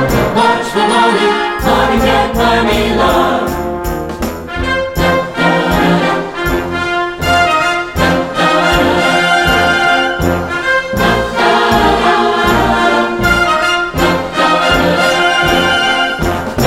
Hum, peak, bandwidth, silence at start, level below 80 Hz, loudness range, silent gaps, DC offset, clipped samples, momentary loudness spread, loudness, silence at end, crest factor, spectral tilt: none; 0 dBFS; 16.5 kHz; 0 s; -28 dBFS; 3 LU; none; under 0.1%; under 0.1%; 6 LU; -12 LUFS; 0 s; 12 dB; -4.5 dB/octave